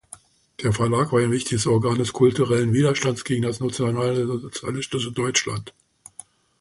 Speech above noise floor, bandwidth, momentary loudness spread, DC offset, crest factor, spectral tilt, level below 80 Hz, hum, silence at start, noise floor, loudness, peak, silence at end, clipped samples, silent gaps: 26 dB; 11.5 kHz; 10 LU; under 0.1%; 18 dB; -5 dB/octave; -52 dBFS; none; 0.6 s; -48 dBFS; -22 LUFS; -4 dBFS; 0.9 s; under 0.1%; none